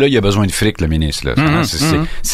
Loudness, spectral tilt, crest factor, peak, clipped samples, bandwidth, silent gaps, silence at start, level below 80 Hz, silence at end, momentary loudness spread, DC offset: -15 LUFS; -5 dB/octave; 12 dB; 0 dBFS; under 0.1%; 15.5 kHz; none; 0 s; -26 dBFS; 0 s; 4 LU; under 0.1%